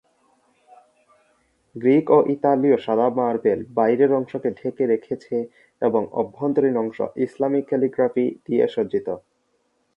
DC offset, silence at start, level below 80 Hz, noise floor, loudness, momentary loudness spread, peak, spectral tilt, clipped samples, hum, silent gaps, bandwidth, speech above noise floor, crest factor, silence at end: under 0.1%; 1.75 s; -66 dBFS; -68 dBFS; -21 LUFS; 9 LU; -2 dBFS; -9 dB/octave; under 0.1%; none; none; 5.6 kHz; 48 dB; 20 dB; 0.8 s